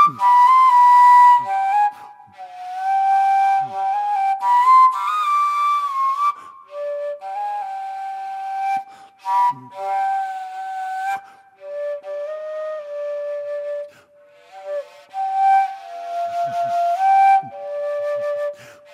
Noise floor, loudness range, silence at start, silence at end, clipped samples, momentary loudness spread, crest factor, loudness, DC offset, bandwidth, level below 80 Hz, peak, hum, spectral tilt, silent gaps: -50 dBFS; 13 LU; 0 s; 0.2 s; under 0.1%; 18 LU; 14 dB; -18 LUFS; under 0.1%; 14.5 kHz; -82 dBFS; -4 dBFS; none; -2.5 dB/octave; none